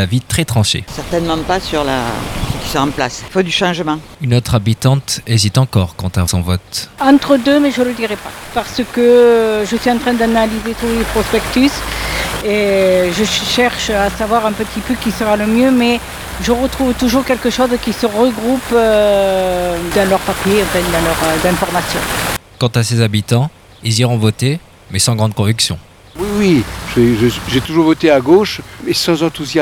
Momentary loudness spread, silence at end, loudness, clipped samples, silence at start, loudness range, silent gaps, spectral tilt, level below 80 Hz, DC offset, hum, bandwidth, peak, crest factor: 8 LU; 0 s; -14 LUFS; under 0.1%; 0 s; 3 LU; none; -5 dB/octave; -32 dBFS; under 0.1%; none; over 20 kHz; 0 dBFS; 14 dB